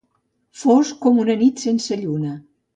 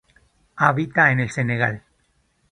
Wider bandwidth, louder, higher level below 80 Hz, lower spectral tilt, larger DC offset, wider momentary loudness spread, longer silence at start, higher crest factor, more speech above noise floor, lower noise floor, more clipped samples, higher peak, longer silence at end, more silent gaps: second, 9 kHz vs 10 kHz; about the same, -19 LUFS vs -20 LUFS; second, -66 dBFS vs -56 dBFS; about the same, -6 dB/octave vs -6.5 dB/octave; neither; first, 10 LU vs 7 LU; about the same, 0.55 s vs 0.55 s; second, 14 dB vs 22 dB; first, 50 dB vs 46 dB; about the same, -68 dBFS vs -65 dBFS; neither; second, -4 dBFS vs 0 dBFS; second, 0.35 s vs 0.75 s; neither